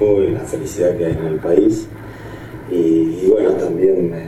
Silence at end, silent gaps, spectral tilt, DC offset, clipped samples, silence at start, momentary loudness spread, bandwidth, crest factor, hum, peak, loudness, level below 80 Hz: 0 s; none; -7.5 dB/octave; under 0.1%; under 0.1%; 0 s; 18 LU; 13.5 kHz; 16 dB; none; 0 dBFS; -16 LUFS; -42 dBFS